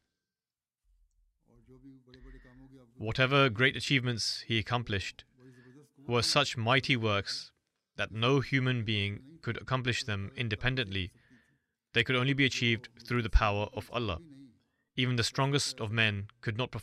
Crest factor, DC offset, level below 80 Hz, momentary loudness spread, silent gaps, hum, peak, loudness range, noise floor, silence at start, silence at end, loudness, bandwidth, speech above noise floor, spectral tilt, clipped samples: 20 dB; under 0.1%; -44 dBFS; 11 LU; none; none; -12 dBFS; 3 LU; under -90 dBFS; 1.7 s; 0 s; -30 LUFS; 13.5 kHz; over 59 dB; -4.5 dB/octave; under 0.1%